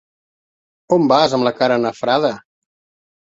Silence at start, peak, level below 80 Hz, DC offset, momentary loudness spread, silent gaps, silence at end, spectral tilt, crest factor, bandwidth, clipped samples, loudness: 0.9 s; 0 dBFS; -62 dBFS; under 0.1%; 6 LU; none; 0.85 s; -5.5 dB/octave; 18 dB; 7.8 kHz; under 0.1%; -16 LUFS